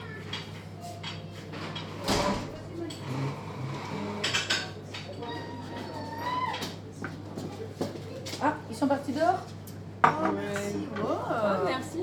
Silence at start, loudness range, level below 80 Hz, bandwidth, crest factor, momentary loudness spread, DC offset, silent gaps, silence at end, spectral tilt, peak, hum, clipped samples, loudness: 0 s; 5 LU; -56 dBFS; 20 kHz; 26 dB; 12 LU; under 0.1%; none; 0 s; -4.5 dB/octave; -6 dBFS; none; under 0.1%; -32 LUFS